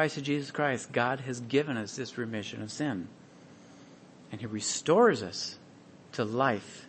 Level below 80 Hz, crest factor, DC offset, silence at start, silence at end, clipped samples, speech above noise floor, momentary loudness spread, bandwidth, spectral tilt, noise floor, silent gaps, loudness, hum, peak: -74 dBFS; 20 dB; under 0.1%; 0 s; 0 s; under 0.1%; 23 dB; 14 LU; 8.8 kHz; -4.5 dB/octave; -54 dBFS; none; -30 LUFS; none; -12 dBFS